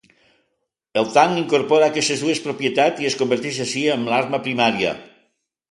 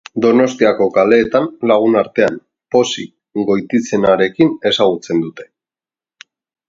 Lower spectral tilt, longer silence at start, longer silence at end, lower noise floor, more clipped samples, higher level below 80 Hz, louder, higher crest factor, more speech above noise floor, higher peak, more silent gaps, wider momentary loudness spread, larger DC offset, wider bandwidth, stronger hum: about the same, -4 dB/octave vs -5 dB/octave; first, 0.95 s vs 0.15 s; second, 0.65 s vs 1.25 s; second, -74 dBFS vs under -90 dBFS; neither; second, -64 dBFS vs -54 dBFS; second, -19 LUFS vs -14 LUFS; about the same, 18 dB vs 14 dB; second, 55 dB vs over 76 dB; about the same, -2 dBFS vs 0 dBFS; neither; about the same, 7 LU vs 8 LU; neither; first, 11.5 kHz vs 7.8 kHz; neither